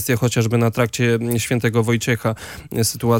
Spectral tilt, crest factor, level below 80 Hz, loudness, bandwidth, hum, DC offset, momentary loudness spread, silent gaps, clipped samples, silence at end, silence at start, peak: -5 dB/octave; 14 dB; -50 dBFS; -19 LUFS; 17 kHz; none; under 0.1%; 5 LU; none; under 0.1%; 0 s; 0 s; -4 dBFS